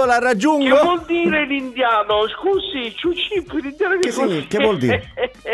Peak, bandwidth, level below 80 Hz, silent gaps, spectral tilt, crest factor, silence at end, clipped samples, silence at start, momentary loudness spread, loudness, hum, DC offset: 0 dBFS; 12 kHz; -48 dBFS; none; -4.5 dB/octave; 18 dB; 0 s; under 0.1%; 0 s; 8 LU; -18 LUFS; none; under 0.1%